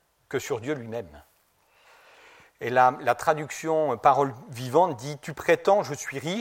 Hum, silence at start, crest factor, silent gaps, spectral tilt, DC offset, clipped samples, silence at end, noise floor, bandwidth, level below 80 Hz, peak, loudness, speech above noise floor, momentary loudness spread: none; 0.3 s; 20 dB; none; -5 dB/octave; under 0.1%; under 0.1%; 0 s; -64 dBFS; 16.5 kHz; -64 dBFS; -6 dBFS; -25 LUFS; 39 dB; 14 LU